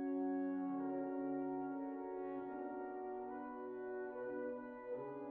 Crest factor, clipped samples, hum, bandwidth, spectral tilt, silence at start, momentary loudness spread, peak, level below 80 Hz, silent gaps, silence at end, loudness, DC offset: 12 dB; under 0.1%; none; 3.1 kHz; -7.5 dB/octave; 0 s; 7 LU; -32 dBFS; -80 dBFS; none; 0 s; -44 LUFS; under 0.1%